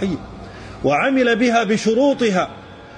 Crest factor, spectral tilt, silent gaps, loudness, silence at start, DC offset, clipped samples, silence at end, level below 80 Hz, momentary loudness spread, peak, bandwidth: 14 dB; -5 dB/octave; none; -17 LUFS; 0 s; under 0.1%; under 0.1%; 0 s; -46 dBFS; 20 LU; -6 dBFS; 10.5 kHz